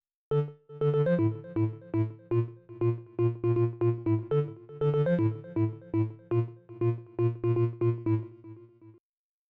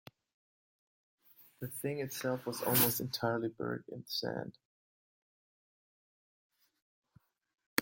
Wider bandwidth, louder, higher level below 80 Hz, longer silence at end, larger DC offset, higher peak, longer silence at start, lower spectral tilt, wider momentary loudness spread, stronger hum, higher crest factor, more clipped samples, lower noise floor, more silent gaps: second, 3.9 kHz vs 17 kHz; first, -30 LUFS vs -35 LUFS; first, -64 dBFS vs -76 dBFS; first, 0.6 s vs 0 s; neither; second, -16 dBFS vs -8 dBFS; second, 0.3 s vs 1.4 s; first, -11.5 dB/octave vs -4 dB/octave; second, 5 LU vs 15 LU; neither; second, 12 dB vs 32 dB; neither; second, -52 dBFS vs -70 dBFS; second, none vs 4.65-6.50 s, 6.82-7.03 s, 7.66-7.77 s